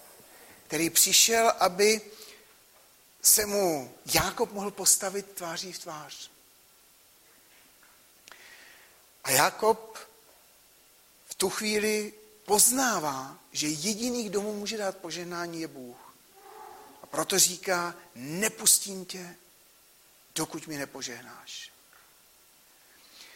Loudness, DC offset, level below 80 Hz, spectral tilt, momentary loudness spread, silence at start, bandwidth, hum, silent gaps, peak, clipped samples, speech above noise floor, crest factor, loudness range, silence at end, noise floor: -26 LUFS; under 0.1%; -64 dBFS; -1.5 dB/octave; 23 LU; 0.35 s; 16.5 kHz; none; none; -6 dBFS; under 0.1%; 31 dB; 24 dB; 15 LU; 0.1 s; -59 dBFS